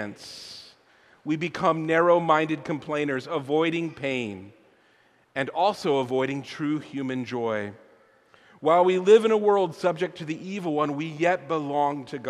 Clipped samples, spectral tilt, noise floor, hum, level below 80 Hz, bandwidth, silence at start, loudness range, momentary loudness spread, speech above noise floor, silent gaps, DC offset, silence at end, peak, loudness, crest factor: under 0.1%; -6 dB/octave; -61 dBFS; none; -70 dBFS; 12 kHz; 0 s; 5 LU; 15 LU; 37 dB; none; under 0.1%; 0 s; -6 dBFS; -25 LUFS; 20 dB